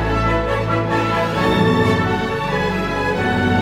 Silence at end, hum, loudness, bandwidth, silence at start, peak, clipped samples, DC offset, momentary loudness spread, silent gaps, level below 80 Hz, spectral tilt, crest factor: 0 s; none; -18 LUFS; 15.5 kHz; 0 s; -4 dBFS; under 0.1%; under 0.1%; 4 LU; none; -32 dBFS; -6.5 dB/octave; 14 dB